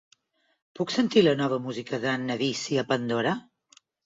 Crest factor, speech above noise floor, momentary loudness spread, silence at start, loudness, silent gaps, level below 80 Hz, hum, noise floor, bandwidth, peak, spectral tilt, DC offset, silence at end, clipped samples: 20 dB; 41 dB; 10 LU; 0.8 s; -26 LUFS; none; -68 dBFS; none; -66 dBFS; 7.8 kHz; -8 dBFS; -5 dB/octave; under 0.1%; 0.65 s; under 0.1%